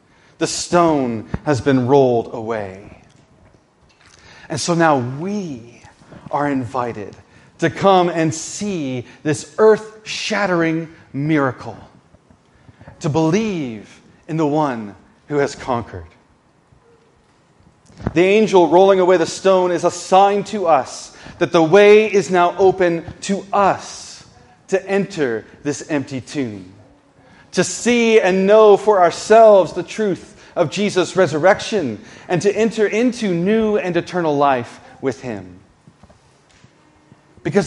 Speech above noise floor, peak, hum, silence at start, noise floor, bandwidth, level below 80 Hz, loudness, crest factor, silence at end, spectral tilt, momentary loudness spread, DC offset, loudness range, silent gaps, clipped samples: 39 dB; 0 dBFS; none; 0.4 s; -55 dBFS; 11.5 kHz; -52 dBFS; -16 LUFS; 18 dB; 0 s; -5.5 dB/octave; 16 LU; under 0.1%; 10 LU; none; under 0.1%